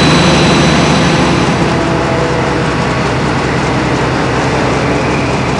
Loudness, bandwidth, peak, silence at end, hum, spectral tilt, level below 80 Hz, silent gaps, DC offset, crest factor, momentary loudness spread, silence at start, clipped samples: -11 LUFS; 11 kHz; 0 dBFS; 0 s; none; -5 dB/octave; -26 dBFS; none; under 0.1%; 10 dB; 5 LU; 0 s; under 0.1%